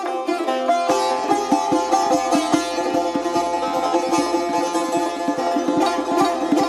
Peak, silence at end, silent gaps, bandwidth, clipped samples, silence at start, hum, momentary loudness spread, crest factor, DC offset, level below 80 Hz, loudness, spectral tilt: -4 dBFS; 0 s; none; 15.5 kHz; under 0.1%; 0 s; none; 3 LU; 16 dB; under 0.1%; -56 dBFS; -20 LUFS; -3.5 dB/octave